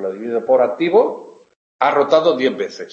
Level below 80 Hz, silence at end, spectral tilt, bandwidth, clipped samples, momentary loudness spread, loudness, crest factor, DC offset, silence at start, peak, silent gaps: -74 dBFS; 0.05 s; -5.5 dB/octave; 7.4 kHz; under 0.1%; 9 LU; -16 LUFS; 16 dB; under 0.1%; 0 s; -2 dBFS; 1.56-1.79 s